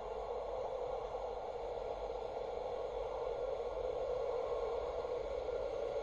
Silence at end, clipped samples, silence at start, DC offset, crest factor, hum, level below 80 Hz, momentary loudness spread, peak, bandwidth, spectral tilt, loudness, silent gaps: 0 s; under 0.1%; 0 s; under 0.1%; 12 dB; none; -56 dBFS; 4 LU; -28 dBFS; 7.8 kHz; -5.5 dB/octave; -41 LUFS; none